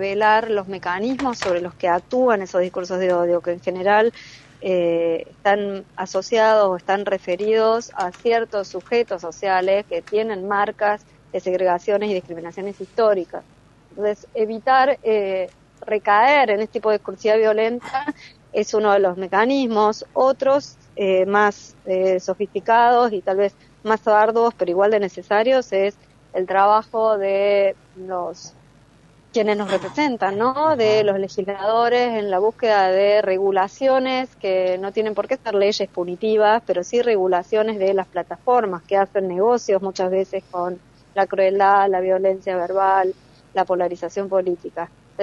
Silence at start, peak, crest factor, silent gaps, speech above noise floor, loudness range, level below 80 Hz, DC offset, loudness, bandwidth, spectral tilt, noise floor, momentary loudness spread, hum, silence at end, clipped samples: 0 s; -4 dBFS; 16 dB; none; 32 dB; 3 LU; -60 dBFS; under 0.1%; -20 LUFS; 8.4 kHz; -5 dB/octave; -52 dBFS; 10 LU; none; 0 s; under 0.1%